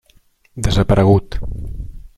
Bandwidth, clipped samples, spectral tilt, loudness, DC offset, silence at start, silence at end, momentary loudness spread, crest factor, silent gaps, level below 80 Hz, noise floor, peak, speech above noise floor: 12.5 kHz; under 0.1%; -7 dB/octave; -15 LUFS; under 0.1%; 0.55 s; 0.1 s; 20 LU; 16 dB; none; -26 dBFS; -54 dBFS; -2 dBFS; 39 dB